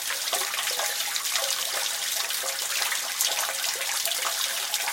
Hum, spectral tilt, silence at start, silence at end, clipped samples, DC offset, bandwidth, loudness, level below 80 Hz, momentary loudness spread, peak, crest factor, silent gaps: none; 3.5 dB/octave; 0 s; 0 s; under 0.1%; under 0.1%; 17 kHz; -25 LUFS; -76 dBFS; 2 LU; -6 dBFS; 22 dB; none